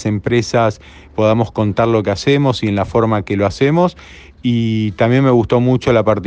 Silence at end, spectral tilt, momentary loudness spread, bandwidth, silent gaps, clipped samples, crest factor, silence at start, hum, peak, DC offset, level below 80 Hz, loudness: 0 s; -7 dB/octave; 5 LU; 8.6 kHz; none; under 0.1%; 14 dB; 0 s; none; 0 dBFS; under 0.1%; -42 dBFS; -15 LUFS